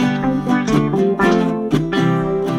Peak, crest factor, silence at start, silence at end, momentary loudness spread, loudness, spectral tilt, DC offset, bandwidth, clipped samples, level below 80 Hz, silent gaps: -2 dBFS; 14 dB; 0 s; 0 s; 3 LU; -17 LUFS; -7 dB/octave; under 0.1%; 14 kHz; under 0.1%; -40 dBFS; none